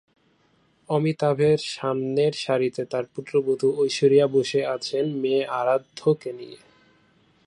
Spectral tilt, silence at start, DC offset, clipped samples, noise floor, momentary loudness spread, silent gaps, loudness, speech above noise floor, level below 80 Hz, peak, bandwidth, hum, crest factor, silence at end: -6 dB/octave; 0.9 s; under 0.1%; under 0.1%; -63 dBFS; 9 LU; none; -23 LUFS; 41 dB; -68 dBFS; -6 dBFS; 11 kHz; none; 18 dB; 0.9 s